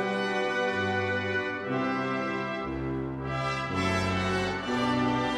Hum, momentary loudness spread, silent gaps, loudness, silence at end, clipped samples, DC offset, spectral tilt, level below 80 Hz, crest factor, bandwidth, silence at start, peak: none; 6 LU; none; -29 LUFS; 0 s; under 0.1%; under 0.1%; -5.5 dB/octave; -50 dBFS; 14 dB; 12.5 kHz; 0 s; -16 dBFS